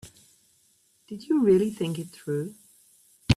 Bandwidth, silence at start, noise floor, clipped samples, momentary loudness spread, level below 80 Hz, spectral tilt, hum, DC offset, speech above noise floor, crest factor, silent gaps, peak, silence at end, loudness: 14 kHz; 0.05 s; -65 dBFS; under 0.1%; 21 LU; -54 dBFS; -7 dB/octave; none; under 0.1%; 40 dB; 22 dB; none; -6 dBFS; 0 s; -26 LUFS